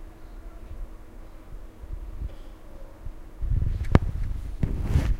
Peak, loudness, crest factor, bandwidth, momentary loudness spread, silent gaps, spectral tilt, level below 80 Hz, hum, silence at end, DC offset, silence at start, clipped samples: 0 dBFS; -29 LUFS; 28 dB; 13.5 kHz; 23 LU; none; -8 dB/octave; -30 dBFS; none; 0 s; under 0.1%; 0 s; under 0.1%